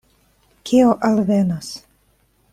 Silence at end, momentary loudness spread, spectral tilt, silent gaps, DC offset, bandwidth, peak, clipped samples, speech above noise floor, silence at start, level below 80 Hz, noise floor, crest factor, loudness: 0.75 s; 20 LU; -6.5 dB/octave; none; under 0.1%; 14.5 kHz; -4 dBFS; under 0.1%; 44 dB; 0.65 s; -54 dBFS; -60 dBFS; 16 dB; -17 LUFS